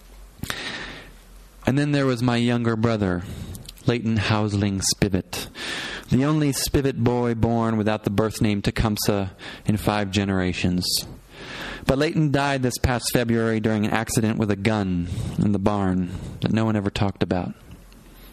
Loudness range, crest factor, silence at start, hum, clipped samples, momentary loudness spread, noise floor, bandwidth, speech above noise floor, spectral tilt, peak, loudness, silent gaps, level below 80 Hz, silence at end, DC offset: 2 LU; 22 dB; 0.05 s; none; under 0.1%; 10 LU; -46 dBFS; 14.5 kHz; 24 dB; -5.5 dB/octave; 0 dBFS; -23 LUFS; none; -42 dBFS; 0 s; under 0.1%